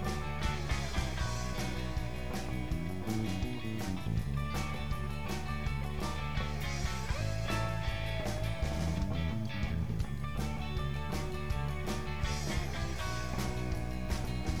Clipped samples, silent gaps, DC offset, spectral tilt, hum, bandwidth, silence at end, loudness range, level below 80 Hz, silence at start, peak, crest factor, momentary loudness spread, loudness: under 0.1%; none; 0.8%; -5.5 dB/octave; none; 19 kHz; 0 s; 1 LU; -40 dBFS; 0 s; -22 dBFS; 14 dB; 3 LU; -37 LUFS